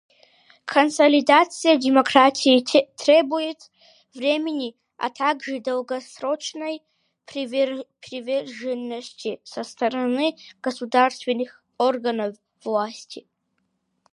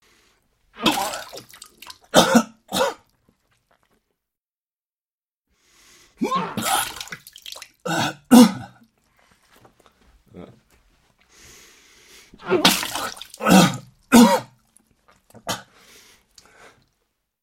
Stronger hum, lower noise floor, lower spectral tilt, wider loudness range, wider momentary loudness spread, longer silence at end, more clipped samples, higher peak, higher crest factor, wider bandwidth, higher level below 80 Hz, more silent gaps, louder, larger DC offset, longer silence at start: neither; second, -73 dBFS vs under -90 dBFS; about the same, -3 dB/octave vs -4 dB/octave; about the same, 11 LU vs 11 LU; second, 17 LU vs 23 LU; second, 0.95 s vs 1.85 s; neither; about the same, 0 dBFS vs 0 dBFS; about the same, 22 dB vs 24 dB; second, 11.5 kHz vs 16.5 kHz; second, -78 dBFS vs -56 dBFS; second, none vs 4.57-5.22 s, 5.28-5.42 s; second, -22 LUFS vs -19 LUFS; neither; second, 0.65 s vs 0.8 s